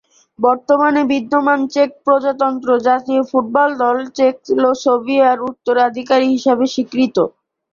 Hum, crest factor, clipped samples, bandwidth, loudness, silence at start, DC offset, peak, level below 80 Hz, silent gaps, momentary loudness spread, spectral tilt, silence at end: none; 14 dB; under 0.1%; 7.2 kHz; -15 LUFS; 0.4 s; under 0.1%; -2 dBFS; -62 dBFS; none; 4 LU; -4.5 dB/octave; 0.45 s